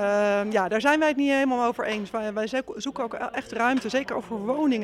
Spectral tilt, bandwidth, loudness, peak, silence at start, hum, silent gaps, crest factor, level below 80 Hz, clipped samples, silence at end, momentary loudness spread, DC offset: -4.5 dB/octave; 13 kHz; -25 LUFS; -8 dBFS; 0 s; none; none; 18 dB; -62 dBFS; under 0.1%; 0 s; 9 LU; under 0.1%